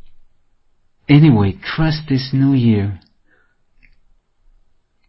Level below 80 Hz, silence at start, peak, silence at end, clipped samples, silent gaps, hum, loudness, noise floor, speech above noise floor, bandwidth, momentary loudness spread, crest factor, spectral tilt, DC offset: -40 dBFS; 0.05 s; 0 dBFS; 2.1 s; under 0.1%; none; none; -15 LUFS; -56 dBFS; 43 dB; 5.8 kHz; 14 LU; 18 dB; -11 dB/octave; under 0.1%